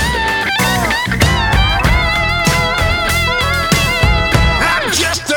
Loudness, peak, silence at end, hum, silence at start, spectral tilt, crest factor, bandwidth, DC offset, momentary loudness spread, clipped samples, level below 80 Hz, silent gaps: -13 LUFS; 0 dBFS; 0 s; none; 0 s; -3.5 dB/octave; 14 dB; over 20 kHz; under 0.1%; 2 LU; under 0.1%; -20 dBFS; none